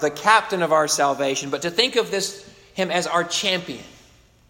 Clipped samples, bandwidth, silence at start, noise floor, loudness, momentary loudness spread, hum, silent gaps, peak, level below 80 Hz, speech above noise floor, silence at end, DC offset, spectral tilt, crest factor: under 0.1%; 16.5 kHz; 0 s; -53 dBFS; -21 LUFS; 13 LU; none; none; -2 dBFS; -62 dBFS; 32 dB; 0.6 s; under 0.1%; -2.5 dB/octave; 20 dB